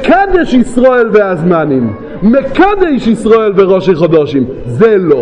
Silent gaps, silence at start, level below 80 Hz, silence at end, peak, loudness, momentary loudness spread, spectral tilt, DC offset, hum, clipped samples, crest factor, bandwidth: none; 0 s; -32 dBFS; 0 s; 0 dBFS; -9 LUFS; 6 LU; -7.5 dB/octave; under 0.1%; none; 0.6%; 8 dB; 10.5 kHz